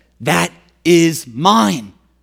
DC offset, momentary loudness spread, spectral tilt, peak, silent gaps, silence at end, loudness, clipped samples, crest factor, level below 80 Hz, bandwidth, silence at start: under 0.1%; 10 LU; -4.5 dB/octave; 0 dBFS; none; 0.35 s; -14 LUFS; under 0.1%; 16 dB; -56 dBFS; 16.5 kHz; 0.2 s